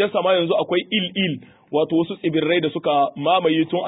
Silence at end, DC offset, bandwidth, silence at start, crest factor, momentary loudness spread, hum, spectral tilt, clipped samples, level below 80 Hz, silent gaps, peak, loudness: 0 s; under 0.1%; 4 kHz; 0 s; 14 dB; 5 LU; none; -10.5 dB/octave; under 0.1%; -66 dBFS; none; -6 dBFS; -20 LUFS